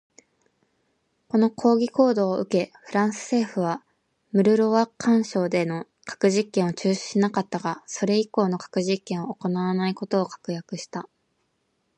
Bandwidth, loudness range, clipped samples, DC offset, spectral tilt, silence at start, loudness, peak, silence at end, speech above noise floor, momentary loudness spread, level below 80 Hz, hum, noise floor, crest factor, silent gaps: 10.5 kHz; 3 LU; under 0.1%; under 0.1%; -6 dB/octave; 1.35 s; -24 LUFS; -6 dBFS; 0.95 s; 49 dB; 11 LU; -72 dBFS; none; -73 dBFS; 18 dB; none